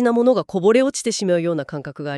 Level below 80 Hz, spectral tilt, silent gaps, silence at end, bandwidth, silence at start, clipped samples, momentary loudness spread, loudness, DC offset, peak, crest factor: -62 dBFS; -5 dB/octave; none; 0 s; 12 kHz; 0 s; under 0.1%; 11 LU; -19 LUFS; under 0.1%; -4 dBFS; 14 dB